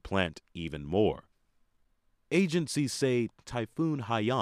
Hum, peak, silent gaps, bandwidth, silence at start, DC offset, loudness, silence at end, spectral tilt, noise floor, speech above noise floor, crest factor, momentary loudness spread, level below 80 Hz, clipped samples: none; -12 dBFS; none; 15 kHz; 0.05 s; under 0.1%; -31 LUFS; 0 s; -5.5 dB/octave; -70 dBFS; 40 dB; 20 dB; 10 LU; -56 dBFS; under 0.1%